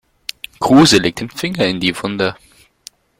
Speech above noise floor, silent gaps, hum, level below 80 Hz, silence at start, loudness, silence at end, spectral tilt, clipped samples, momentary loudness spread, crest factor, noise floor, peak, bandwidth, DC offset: 29 dB; none; none; -48 dBFS; 0.6 s; -14 LUFS; 0.85 s; -4.5 dB/octave; under 0.1%; 19 LU; 16 dB; -43 dBFS; 0 dBFS; 16.5 kHz; under 0.1%